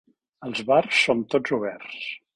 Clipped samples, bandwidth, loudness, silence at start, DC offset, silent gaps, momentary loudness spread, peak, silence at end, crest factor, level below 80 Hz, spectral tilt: under 0.1%; 11 kHz; -23 LUFS; 0.4 s; under 0.1%; none; 14 LU; -6 dBFS; 0.2 s; 20 dB; -66 dBFS; -4 dB/octave